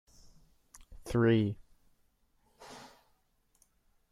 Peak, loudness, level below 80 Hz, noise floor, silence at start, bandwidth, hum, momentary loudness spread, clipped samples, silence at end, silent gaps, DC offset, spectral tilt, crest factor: -14 dBFS; -30 LUFS; -58 dBFS; -73 dBFS; 0.9 s; 13.5 kHz; none; 25 LU; under 0.1%; 1.3 s; none; under 0.1%; -7.5 dB/octave; 22 dB